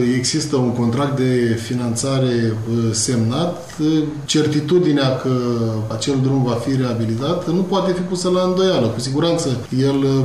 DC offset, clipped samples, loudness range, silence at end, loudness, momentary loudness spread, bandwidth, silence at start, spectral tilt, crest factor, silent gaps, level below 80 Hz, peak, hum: 0.5%; under 0.1%; 1 LU; 0 s; -18 LUFS; 4 LU; 13 kHz; 0 s; -5.5 dB/octave; 12 dB; none; -50 dBFS; -6 dBFS; none